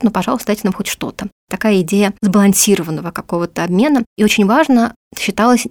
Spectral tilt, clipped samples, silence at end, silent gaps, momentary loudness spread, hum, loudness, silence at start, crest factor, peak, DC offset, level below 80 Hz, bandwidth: -4.5 dB/octave; under 0.1%; 0 s; 1.32-1.47 s, 4.06-4.16 s, 4.96-5.11 s; 11 LU; none; -14 LUFS; 0 s; 14 dB; 0 dBFS; under 0.1%; -48 dBFS; 19.5 kHz